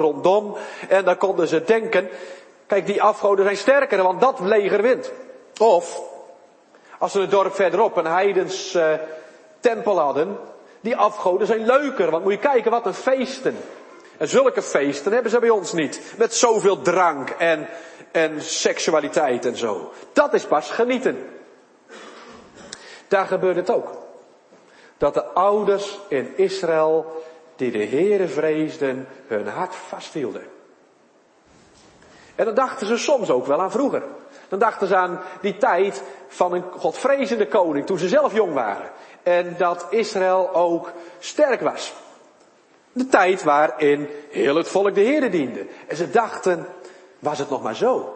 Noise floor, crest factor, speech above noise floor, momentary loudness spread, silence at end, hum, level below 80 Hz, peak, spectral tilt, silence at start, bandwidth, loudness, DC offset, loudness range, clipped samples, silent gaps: -56 dBFS; 20 dB; 36 dB; 15 LU; 0 s; none; -66 dBFS; 0 dBFS; -4 dB/octave; 0 s; 8.8 kHz; -20 LUFS; under 0.1%; 5 LU; under 0.1%; none